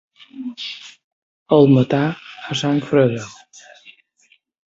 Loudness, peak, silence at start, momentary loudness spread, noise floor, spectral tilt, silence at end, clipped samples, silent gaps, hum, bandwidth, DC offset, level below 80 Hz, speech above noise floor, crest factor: -18 LUFS; -2 dBFS; 0.35 s; 19 LU; -59 dBFS; -6.5 dB/octave; 1.35 s; under 0.1%; 1.04-1.46 s; none; 7.8 kHz; under 0.1%; -60 dBFS; 42 dB; 18 dB